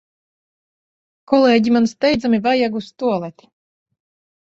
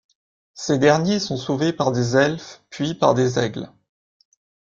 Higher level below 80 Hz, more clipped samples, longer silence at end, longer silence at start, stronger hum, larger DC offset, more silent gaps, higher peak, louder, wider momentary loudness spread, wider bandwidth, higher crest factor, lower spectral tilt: about the same, -54 dBFS vs -58 dBFS; neither; about the same, 1.2 s vs 1.1 s; first, 1.3 s vs 0.55 s; neither; neither; neither; about the same, -2 dBFS vs -2 dBFS; first, -17 LUFS vs -20 LUFS; second, 9 LU vs 16 LU; about the same, 7.6 kHz vs 7.6 kHz; about the same, 18 dB vs 20 dB; about the same, -5.5 dB/octave vs -5.5 dB/octave